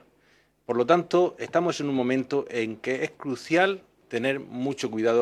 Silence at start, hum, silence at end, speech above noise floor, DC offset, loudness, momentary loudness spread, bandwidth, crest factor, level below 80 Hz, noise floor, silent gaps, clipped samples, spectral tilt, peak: 0.7 s; none; 0 s; 38 dB; under 0.1%; -26 LUFS; 8 LU; 12 kHz; 20 dB; -72 dBFS; -63 dBFS; none; under 0.1%; -5.5 dB/octave; -6 dBFS